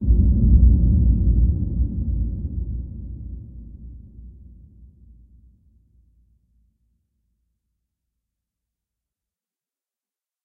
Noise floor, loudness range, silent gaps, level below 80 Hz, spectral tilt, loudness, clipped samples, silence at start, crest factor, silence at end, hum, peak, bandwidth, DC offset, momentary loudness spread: under -90 dBFS; 25 LU; none; -24 dBFS; -17.5 dB/octave; -20 LUFS; under 0.1%; 0 s; 18 dB; 6.15 s; none; -4 dBFS; 0.8 kHz; under 0.1%; 25 LU